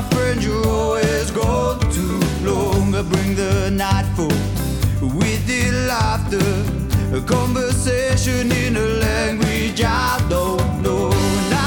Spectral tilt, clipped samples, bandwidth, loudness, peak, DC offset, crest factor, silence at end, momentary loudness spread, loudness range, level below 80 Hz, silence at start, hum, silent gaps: -5.5 dB/octave; under 0.1%; 19 kHz; -19 LUFS; -6 dBFS; under 0.1%; 12 dB; 0 s; 2 LU; 1 LU; -28 dBFS; 0 s; none; none